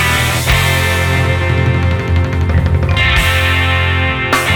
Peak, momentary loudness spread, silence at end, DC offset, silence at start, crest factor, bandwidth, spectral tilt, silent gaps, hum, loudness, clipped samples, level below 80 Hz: 0 dBFS; 3 LU; 0 s; under 0.1%; 0 s; 12 dB; 19.5 kHz; -4.5 dB/octave; none; none; -12 LUFS; under 0.1%; -22 dBFS